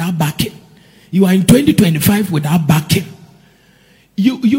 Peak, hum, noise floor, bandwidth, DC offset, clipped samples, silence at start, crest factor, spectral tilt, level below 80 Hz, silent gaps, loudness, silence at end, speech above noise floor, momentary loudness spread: 0 dBFS; none; -49 dBFS; over 20 kHz; under 0.1%; 0.3%; 0 s; 14 dB; -6 dB/octave; -44 dBFS; none; -13 LUFS; 0 s; 37 dB; 11 LU